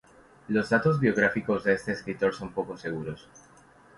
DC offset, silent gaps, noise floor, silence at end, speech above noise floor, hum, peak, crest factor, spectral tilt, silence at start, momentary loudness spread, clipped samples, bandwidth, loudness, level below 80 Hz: under 0.1%; none; -56 dBFS; 0.8 s; 29 dB; none; -8 dBFS; 20 dB; -7 dB/octave; 0.5 s; 11 LU; under 0.1%; 11.5 kHz; -27 LUFS; -58 dBFS